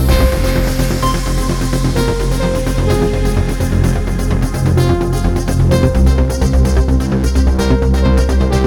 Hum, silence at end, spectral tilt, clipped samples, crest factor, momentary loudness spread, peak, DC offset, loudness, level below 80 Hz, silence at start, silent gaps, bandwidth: none; 0 s; -6.5 dB/octave; under 0.1%; 12 dB; 4 LU; -2 dBFS; under 0.1%; -14 LUFS; -16 dBFS; 0 s; none; 17.5 kHz